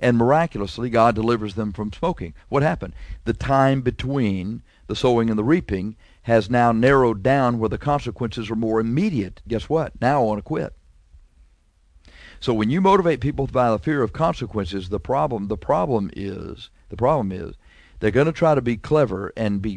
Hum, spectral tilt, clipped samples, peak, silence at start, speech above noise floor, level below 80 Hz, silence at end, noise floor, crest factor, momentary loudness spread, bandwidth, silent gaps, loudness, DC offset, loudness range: none; -7.5 dB/octave; under 0.1%; -4 dBFS; 0 s; 37 dB; -42 dBFS; 0 s; -57 dBFS; 18 dB; 12 LU; 10.5 kHz; none; -21 LUFS; under 0.1%; 4 LU